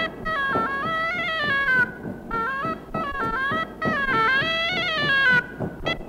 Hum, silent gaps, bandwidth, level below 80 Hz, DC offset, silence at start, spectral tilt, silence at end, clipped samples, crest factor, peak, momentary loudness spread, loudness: none; none; 16 kHz; -46 dBFS; under 0.1%; 0 s; -4.5 dB/octave; 0 s; under 0.1%; 14 dB; -10 dBFS; 9 LU; -22 LUFS